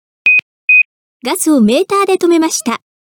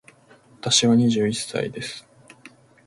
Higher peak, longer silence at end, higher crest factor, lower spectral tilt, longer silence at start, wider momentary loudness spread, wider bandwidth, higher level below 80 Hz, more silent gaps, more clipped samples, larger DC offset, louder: about the same, -2 dBFS vs -4 dBFS; second, 0.35 s vs 0.85 s; second, 10 dB vs 20 dB; about the same, -3.5 dB/octave vs -4 dB/octave; second, 0.25 s vs 0.65 s; second, 11 LU vs 17 LU; first, 19.5 kHz vs 11.5 kHz; about the same, -60 dBFS vs -60 dBFS; first, 0.42-0.68 s, 0.85-1.20 s vs none; neither; neither; first, -11 LUFS vs -21 LUFS